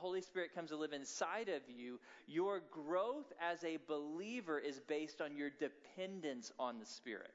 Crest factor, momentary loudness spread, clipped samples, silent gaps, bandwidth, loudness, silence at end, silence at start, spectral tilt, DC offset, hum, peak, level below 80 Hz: 18 dB; 9 LU; under 0.1%; none; 7.6 kHz; -45 LUFS; 0 s; 0 s; -2.5 dB/octave; under 0.1%; none; -26 dBFS; under -90 dBFS